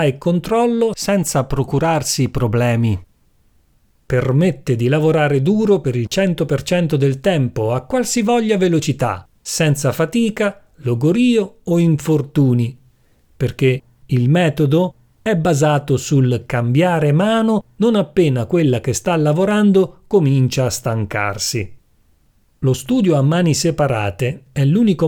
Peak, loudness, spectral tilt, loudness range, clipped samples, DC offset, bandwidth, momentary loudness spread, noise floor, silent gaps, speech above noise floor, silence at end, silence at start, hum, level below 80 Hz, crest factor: -2 dBFS; -17 LUFS; -6 dB/octave; 3 LU; under 0.1%; under 0.1%; 18 kHz; 6 LU; -56 dBFS; none; 41 dB; 0 s; 0 s; none; -44 dBFS; 14 dB